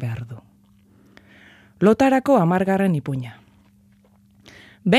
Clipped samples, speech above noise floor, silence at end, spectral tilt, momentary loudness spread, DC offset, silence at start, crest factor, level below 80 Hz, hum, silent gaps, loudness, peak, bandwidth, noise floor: under 0.1%; 37 dB; 0 s; -7 dB/octave; 21 LU; under 0.1%; 0 s; 18 dB; -58 dBFS; none; none; -19 LUFS; -4 dBFS; 14.5 kHz; -55 dBFS